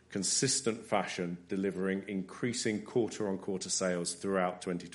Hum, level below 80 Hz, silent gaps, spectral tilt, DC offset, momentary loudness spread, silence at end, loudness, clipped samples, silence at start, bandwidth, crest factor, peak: none; -72 dBFS; none; -3.5 dB/octave; under 0.1%; 7 LU; 0 s; -33 LUFS; under 0.1%; 0.1 s; 11.5 kHz; 20 dB; -14 dBFS